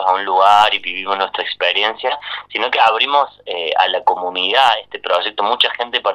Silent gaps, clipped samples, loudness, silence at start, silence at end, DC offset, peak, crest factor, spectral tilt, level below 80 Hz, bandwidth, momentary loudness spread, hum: none; under 0.1%; -15 LUFS; 0 s; 0 s; under 0.1%; 0 dBFS; 16 dB; -1.5 dB/octave; -62 dBFS; 12.5 kHz; 9 LU; 50 Hz at -60 dBFS